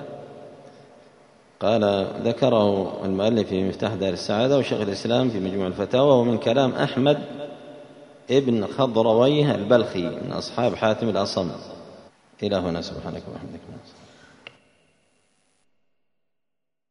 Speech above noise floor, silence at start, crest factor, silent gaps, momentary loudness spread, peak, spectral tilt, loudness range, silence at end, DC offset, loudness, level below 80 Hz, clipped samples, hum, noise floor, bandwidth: 63 dB; 0 s; 20 dB; none; 19 LU; -2 dBFS; -6.5 dB/octave; 11 LU; 3.1 s; under 0.1%; -22 LUFS; -60 dBFS; under 0.1%; none; -85 dBFS; 10.5 kHz